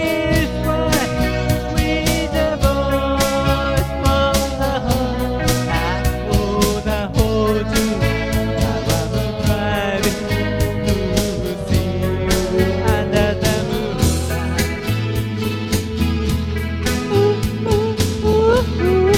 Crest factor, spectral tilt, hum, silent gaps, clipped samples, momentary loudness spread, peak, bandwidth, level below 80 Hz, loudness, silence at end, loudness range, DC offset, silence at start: 18 dB; -5.5 dB/octave; none; none; under 0.1%; 4 LU; 0 dBFS; 17 kHz; -26 dBFS; -18 LUFS; 0 s; 2 LU; under 0.1%; 0 s